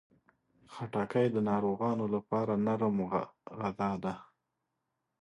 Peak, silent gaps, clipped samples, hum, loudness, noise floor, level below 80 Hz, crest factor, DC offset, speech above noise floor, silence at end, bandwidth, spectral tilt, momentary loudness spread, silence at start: -16 dBFS; none; under 0.1%; none; -33 LUFS; -84 dBFS; -68 dBFS; 18 dB; under 0.1%; 52 dB; 1 s; 10.5 kHz; -8.5 dB/octave; 11 LU; 0.7 s